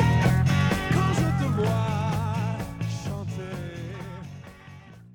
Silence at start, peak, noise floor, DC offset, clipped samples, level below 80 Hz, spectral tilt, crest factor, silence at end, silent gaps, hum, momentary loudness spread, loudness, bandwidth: 0 s; -10 dBFS; -46 dBFS; under 0.1%; under 0.1%; -40 dBFS; -6.5 dB/octave; 16 dB; 0.05 s; none; none; 19 LU; -26 LUFS; 18 kHz